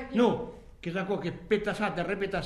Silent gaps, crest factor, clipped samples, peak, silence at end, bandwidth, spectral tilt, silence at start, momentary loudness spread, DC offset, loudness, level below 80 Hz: none; 18 dB; under 0.1%; -12 dBFS; 0 s; 12 kHz; -6.5 dB/octave; 0 s; 9 LU; under 0.1%; -30 LUFS; -52 dBFS